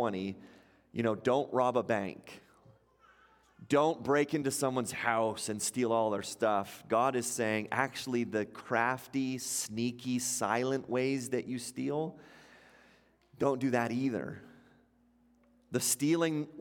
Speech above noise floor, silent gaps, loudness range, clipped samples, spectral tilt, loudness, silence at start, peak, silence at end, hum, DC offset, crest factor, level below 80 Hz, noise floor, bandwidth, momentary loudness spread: 35 dB; none; 4 LU; under 0.1%; -4 dB/octave; -32 LUFS; 0 s; -12 dBFS; 0 s; none; under 0.1%; 22 dB; -74 dBFS; -68 dBFS; 17 kHz; 8 LU